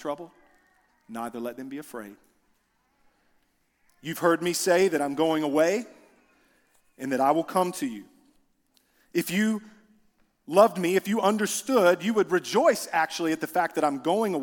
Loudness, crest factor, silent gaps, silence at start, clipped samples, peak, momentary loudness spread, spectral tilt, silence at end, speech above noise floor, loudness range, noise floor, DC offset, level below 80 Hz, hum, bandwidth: -25 LUFS; 22 dB; none; 0 s; under 0.1%; -6 dBFS; 17 LU; -4.5 dB/octave; 0 s; 45 dB; 16 LU; -70 dBFS; under 0.1%; -72 dBFS; none; 18 kHz